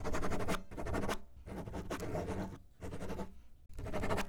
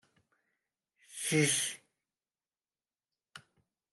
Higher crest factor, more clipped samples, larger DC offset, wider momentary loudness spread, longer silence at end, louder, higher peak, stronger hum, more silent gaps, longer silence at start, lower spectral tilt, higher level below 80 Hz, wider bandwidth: second, 16 dB vs 22 dB; neither; neither; second, 10 LU vs 21 LU; second, 0 s vs 0.55 s; second, -42 LUFS vs -31 LUFS; second, -22 dBFS vs -16 dBFS; neither; neither; second, 0 s vs 1.1 s; first, -5.5 dB/octave vs -3 dB/octave; first, -46 dBFS vs -84 dBFS; first, 18 kHz vs 12.5 kHz